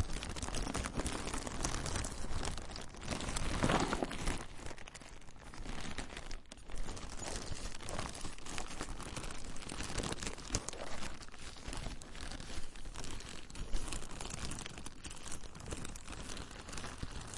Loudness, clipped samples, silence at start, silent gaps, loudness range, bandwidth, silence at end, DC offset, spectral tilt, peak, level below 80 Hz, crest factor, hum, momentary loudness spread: -43 LUFS; under 0.1%; 0 s; none; 8 LU; 11.5 kHz; 0 s; under 0.1%; -3.5 dB/octave; -16 dBFS; -46 dBFS; 24 dB; none; 10 LU